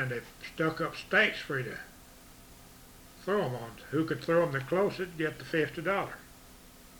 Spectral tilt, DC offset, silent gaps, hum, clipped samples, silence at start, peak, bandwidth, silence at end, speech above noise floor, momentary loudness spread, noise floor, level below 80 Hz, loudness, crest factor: -5.5 dB/octave; under 0.1%; none; none; under 0.1%; 0 s; -12 dBFS; over 20 kHz; 0 s; 22 dB; 23 LU; -53 dBFS; -60 dBFS; -31 LUFS; 22 dB